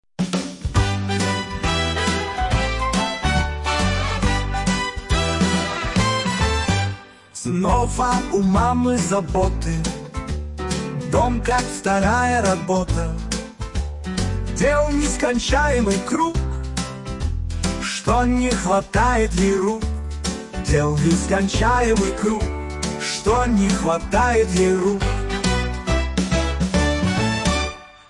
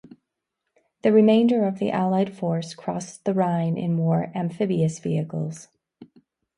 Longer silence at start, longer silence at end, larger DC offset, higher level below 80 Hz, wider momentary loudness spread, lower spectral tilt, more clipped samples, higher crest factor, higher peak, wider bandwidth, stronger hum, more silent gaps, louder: second, 0.2 s vs 1.05 s; second, 0.2 s vs 0.55 s; neither; first, -28 dBFS vs -66 dBFS; second, 9 LU vs 13 LU; second, -5 dB/octave vs -7.5 dB/octave; neither; about the same, 14 dB vs 18 dB; about the same, -6 dBFS vs -6 dBFS; about the same, 11.5 kHz vs 11 kHz; neither; neither; about the same, -21 LUFS vs -23 LUFS